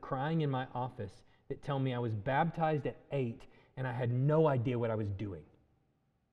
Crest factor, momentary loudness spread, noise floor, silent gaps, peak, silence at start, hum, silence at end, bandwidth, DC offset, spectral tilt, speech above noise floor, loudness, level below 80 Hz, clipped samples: 18 dB; 16 LU; -76 dBFS; none; -18 dBFS; 0 s; none; 0.9 s; 6.2 kHz; under 0.1%; -9 dB/octave; 42 dB; -35 LUFS; -62 dBFS; under 0.1%